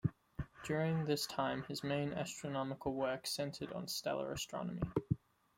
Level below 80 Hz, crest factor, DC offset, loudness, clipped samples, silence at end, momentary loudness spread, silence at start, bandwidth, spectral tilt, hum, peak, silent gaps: -62 dBFS; 20 dB; under 0.1%; -40 LUFS; under 0.1%; 0.4 s; 6 LU; 0.05 s; 16.5 kHz; -5 dB/octave; none; -20 dBFS; none